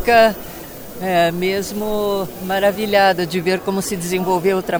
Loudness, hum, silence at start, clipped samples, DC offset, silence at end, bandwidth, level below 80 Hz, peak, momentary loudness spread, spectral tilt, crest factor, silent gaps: -18 LUFS; none; 0 s; under 0.1%; under 0.1%; 0 s; over 20 kHz; -44 dBFS; -2 dBFS; 11 LU; -4.5 dB/octave; 16 dB; none